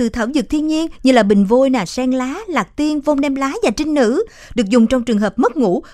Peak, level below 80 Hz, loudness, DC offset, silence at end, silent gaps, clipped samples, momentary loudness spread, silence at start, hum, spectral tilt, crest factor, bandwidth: 0 dBFS; -40 dBFS; -16 LUFS; under 0.1%; 0.05 s; none; under 0.1%; 8 LU; 0 s; none; -5.5 dB/octave; 16 dB; 13 kHz